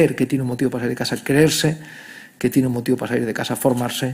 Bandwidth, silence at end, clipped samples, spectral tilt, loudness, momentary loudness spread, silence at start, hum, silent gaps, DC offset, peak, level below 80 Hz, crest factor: 16 kHz; 0 s; under 0.1%; -5 dB/octave; -20 LUFS; 10 LU; 0 s; none; none; under 0.1%; -2 dBFS; -52 dBFS; 18 dB